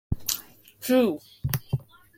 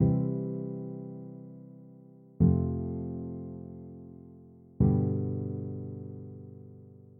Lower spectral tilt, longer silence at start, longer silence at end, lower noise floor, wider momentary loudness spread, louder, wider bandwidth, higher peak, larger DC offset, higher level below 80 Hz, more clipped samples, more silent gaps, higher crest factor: second, -5 dB/octave vs -15.5 dB/octave; about the same, 0.1 s vs 0 s; first, 0.35 s vs 0 s; second, -46 dBFS vs -53 dBFS; second, 11 LU vs 24 LU; first, -27 LUFS vs -31 LUFS; first, 17 kHz vs 2.1 kHz; first, -4 dBFS vs -12 dBFS; neither; about the same, -44 dBFS vs -48 dBFS; neither; neither; about the same, 24 dB vs 20 dB